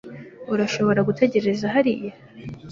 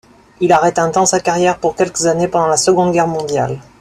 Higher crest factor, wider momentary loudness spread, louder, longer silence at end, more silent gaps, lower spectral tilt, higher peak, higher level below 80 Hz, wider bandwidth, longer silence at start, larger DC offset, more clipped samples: first, 20 dB vs 14 dB; first, 19 LU vs 6 LU; second, -21 LUFS vs -14 LUFS; second, 0 s vs 0.2 s; neither; first, -6.5 dB/octave vs -4 dB/octave; second, -4 dBFS vs 0 dBFS; second, -58 dBFS vs -48 dBFS; second, 7.4 kHz vs 14 kHz; second, 0.05 s vs 0.4 s; neither; neither